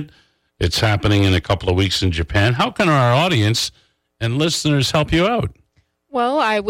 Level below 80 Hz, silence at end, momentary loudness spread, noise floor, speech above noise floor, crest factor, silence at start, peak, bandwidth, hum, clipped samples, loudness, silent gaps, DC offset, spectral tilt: -38 dBFS; 0 s; 8 LU; -62 dBFS; 45 dB; 10 dB; 0 s; -6 dBFS; 16 kHz; none; under 0.1%; -17 LUFS; none; under 0.1%; -5 dB/octave